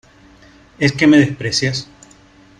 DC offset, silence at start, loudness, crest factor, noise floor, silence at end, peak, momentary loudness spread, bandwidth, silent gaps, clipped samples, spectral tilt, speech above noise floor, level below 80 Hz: under 0.1%; 0.8 s; -15 LUFS; 16 dB; -47 dBFS; 0.75 s; -2 dBFS; 9 LU; 10.5 kHz; none; under 0.1%; -5 dB/octave; 32 dB; -50 dBFS